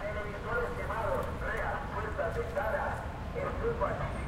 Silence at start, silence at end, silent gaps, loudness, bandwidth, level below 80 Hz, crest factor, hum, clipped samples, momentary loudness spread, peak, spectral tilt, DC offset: 0 s; 0 s; none; -35 LUFS; 16.5 kHz; -42 dBFS; 16 dB; none; under 0.1%; 4 LU; -18 dBFS; -6.5 dB/octave; under 0.1%